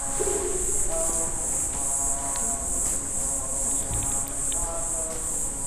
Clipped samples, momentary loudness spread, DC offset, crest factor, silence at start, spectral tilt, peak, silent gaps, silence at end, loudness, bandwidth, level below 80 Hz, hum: under 0.1%; 3 LU; 0.1%; 14 dB; 0 s; -2.5 dB/octave; -12 dBFS; none; 0 s; -25 LUFS; 16 kHz; -38 dBFS; none